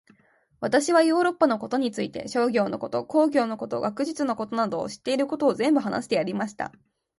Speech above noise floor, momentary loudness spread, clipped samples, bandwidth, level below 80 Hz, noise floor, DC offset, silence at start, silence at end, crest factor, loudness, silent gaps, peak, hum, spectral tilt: 36 dB; 9 LU; under 0.1%; 11.5 kHz; -66 dBFS; -60 dBFS; under 0.1%; 0.6 s; 0.5 s; 18 dB; -25 LUFS; none; -6 dBFS; none; -5 dB/octave